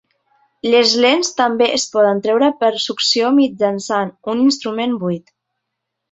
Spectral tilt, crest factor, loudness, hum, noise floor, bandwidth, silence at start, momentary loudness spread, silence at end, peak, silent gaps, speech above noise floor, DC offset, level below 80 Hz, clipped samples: -3.5 dB/octave; 16 dB; -16 LUFS; none; -77 dBFS; 8.2 kHz; 0.65 s; 8 LU; 0.95 s; 0 dBFS; none; 62 dB; under 0.1%; -64 dBFS; under 0.1%